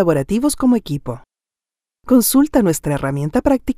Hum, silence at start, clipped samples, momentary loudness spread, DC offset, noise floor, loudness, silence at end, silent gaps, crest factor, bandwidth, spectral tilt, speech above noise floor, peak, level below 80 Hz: none; 0 s; under 0.1%; 12 LU; under 0.1%; -90 dBFS; -16 LUFS; 0.05 s; none; 16 dB; 16 kHz; -5.5 dB/octave; 74 dB; 0 dBFS; -38 dBFS